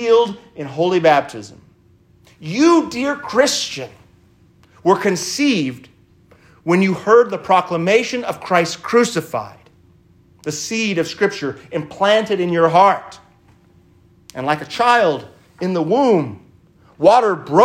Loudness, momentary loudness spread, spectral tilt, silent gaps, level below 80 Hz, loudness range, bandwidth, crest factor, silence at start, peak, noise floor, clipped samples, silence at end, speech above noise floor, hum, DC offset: -17 LUFS; 14 LU; -4.5 dB/octave; none; -60 dBFS; 4 LU; 16 kHz; 18 dB; 0 s; 0 dBFS; -52 dBFS; under 0.1%; 0 s; 36 dB; none; under 0.1%